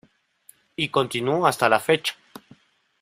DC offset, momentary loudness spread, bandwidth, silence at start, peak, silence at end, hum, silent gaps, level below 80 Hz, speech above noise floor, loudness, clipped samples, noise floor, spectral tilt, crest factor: under 0.1%; 14 LU; 16 kHz; 0.8 s; -2 dBFS; 0.9 s; none; none; -64 dBFS; 35 dB; -22 LUFS; under 0.1%; -57 dBFS; -4 dB/octave; 22 dB